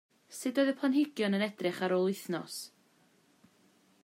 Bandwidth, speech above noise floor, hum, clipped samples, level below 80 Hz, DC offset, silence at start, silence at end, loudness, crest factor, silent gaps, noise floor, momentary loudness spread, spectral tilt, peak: 16 kHz; 36 dB; none; under 0.1%; -88 dBFS; under 0.1%; 0.3 s; 1.35 s; -32 LUFS; 16 dB; none; -67 dBFS; 13 LU; -5 dB/octave; -18 dBFS